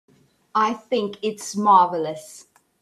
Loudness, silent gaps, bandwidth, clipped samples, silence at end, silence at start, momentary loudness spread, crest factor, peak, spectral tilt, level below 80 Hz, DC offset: -21 LUFS; none; 14 kHz; under 0.1%; 0.4 s; 0.55 s; 14 LU; 20 dB; -4 dBFS; -4.5 dB/octave; -72 dBFS; under 0.1%